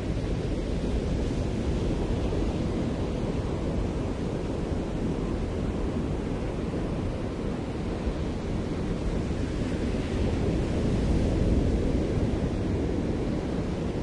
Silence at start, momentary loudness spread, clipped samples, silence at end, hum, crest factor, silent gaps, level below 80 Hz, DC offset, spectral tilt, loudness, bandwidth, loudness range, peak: 0 s; 5 LU; under 0.1%; 0 s; none; 14 dB; none; -34 dBFS; under 0.1%; -7.5 dB/octave; -29 LUFS; 11 kHz; 4 LU; -12 dBFS